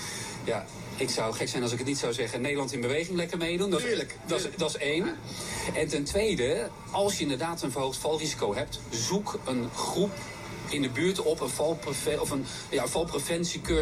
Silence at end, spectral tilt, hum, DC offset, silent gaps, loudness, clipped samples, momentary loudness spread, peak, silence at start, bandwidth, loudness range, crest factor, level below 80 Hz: 0 s; -4 dB/octave; none; under 0.1%; none; -30 LUFS; under 0.1%; 6 LU; -14 dBFS; 0 s; 15.5 kHz; 1 LU; 16 dB; -50 dBFS